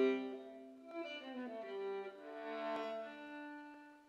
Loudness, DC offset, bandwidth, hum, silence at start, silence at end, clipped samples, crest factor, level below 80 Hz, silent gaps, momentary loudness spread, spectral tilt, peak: -46 LUFS; under 0.1%; 8 kHz; none; 0 s; 0 s; under 0.1%; 20 dB; under -90 dBFS; none; 10 LU; -5 dB/octave; -24 dBFS